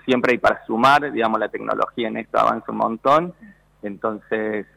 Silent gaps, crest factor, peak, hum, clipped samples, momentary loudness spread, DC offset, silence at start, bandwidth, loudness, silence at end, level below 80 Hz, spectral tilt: none; 14 dB; -6 dBFS; none; under 0.1%; 11 LU; under 0.1%; 0.05 s; 15.5 kHz; -20 LUFS; 0.1 s; -56 dBFS; -5.5 dB/octave